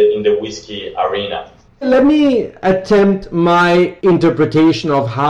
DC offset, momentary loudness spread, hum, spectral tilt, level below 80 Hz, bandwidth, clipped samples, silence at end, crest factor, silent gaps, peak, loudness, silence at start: under 0.1%; 12 LU; none; -7 dB/octave; -44 dBFS; 9.4 kHz; under 0.1%; 0 s; 10 dB; none; -2 dBFS; -13 LUFS; 0 s